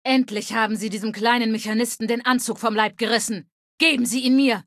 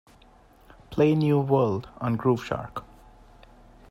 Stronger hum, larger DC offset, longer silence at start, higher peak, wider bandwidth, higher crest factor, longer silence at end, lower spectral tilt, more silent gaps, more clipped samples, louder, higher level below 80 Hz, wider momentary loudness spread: neither; neither; second, 0.05 s vs 0.9 s; first, -4 dBFS vs -8 dBFS; about the same, 14.5 kHz vs 13.5 kHz; about the same, 18 dB vs 18 dB; second, 0.05 s vs 1.1 s; second, -3 dB/octave vs -8.5 dB/octave; first, 3.52-3.78 s vs none; neither; first, -21 LUFS vs -25 LUFS; second, -70 dBFS vs -54 dBFS; second, 6 LU vs 13 LU